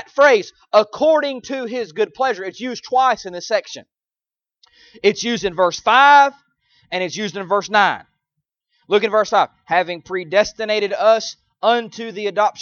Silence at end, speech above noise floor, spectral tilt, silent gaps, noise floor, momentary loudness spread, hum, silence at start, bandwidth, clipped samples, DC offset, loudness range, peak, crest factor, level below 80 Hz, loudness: 0 s; over 73 dB; -3 dB/octave; none; under -90 dBFS; 12 LU; none; 0.15 s; 7.2 kHz; under 0.1%; under 0.1%; 6 LU; 0 dBFS; 18 dB; -60 dBFS; -17 LUFS